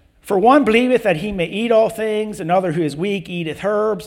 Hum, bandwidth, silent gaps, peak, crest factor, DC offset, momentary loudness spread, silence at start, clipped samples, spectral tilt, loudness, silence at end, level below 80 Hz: none; 16.5 kHz; none; -2 dBFS; 16 dB; under 0.1%; 10 LU; 0.25 s; under 0.1%; -6 dB/octave; -17 LUFS; 0 s; -48 dBFS